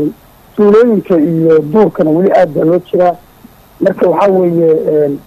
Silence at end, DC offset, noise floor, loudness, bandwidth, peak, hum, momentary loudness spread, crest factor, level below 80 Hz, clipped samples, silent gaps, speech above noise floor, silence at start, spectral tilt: 0.05 s; under 0.1%; -40 dBFS; -10 LUFS; 13.5 kHz; -2 dBFS; none; 6 LU; 8 dB; -48 dBFS; under 0.1%; none; 31 dB; 0 s; -9 dB/octave